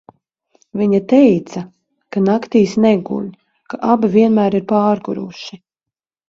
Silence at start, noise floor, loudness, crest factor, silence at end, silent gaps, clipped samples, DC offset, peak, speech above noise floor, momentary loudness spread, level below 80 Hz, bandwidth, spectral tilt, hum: 0.75 s; -85 dBFS; -15 LUFS; 16 dB; 0.75 s; none; under 0.1%; under 0.1%; 0 dBFS; 71 dB; 18 LU; -58 dBFS; 7.4 kHz; -7.5 dB/octave; none